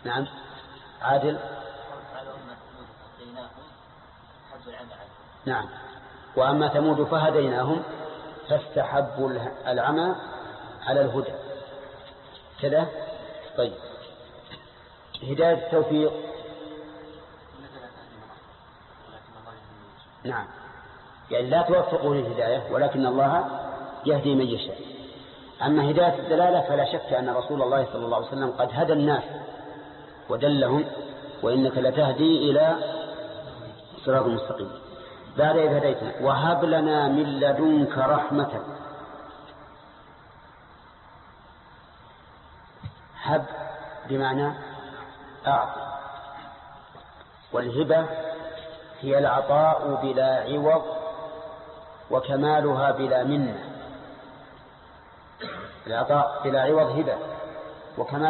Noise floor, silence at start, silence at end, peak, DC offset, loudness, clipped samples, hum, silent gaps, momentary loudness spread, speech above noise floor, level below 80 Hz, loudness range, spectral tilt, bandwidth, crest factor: -51 dBFS; 0 s; 0 s; -10 dBFS; under 0.1%; -24 LUFS; under 0.1%; none; none; 22 LU; 27 dB; -60 dBFS; 12 LU; -10.5 dB/octave; 4.3 kHz; 16 dB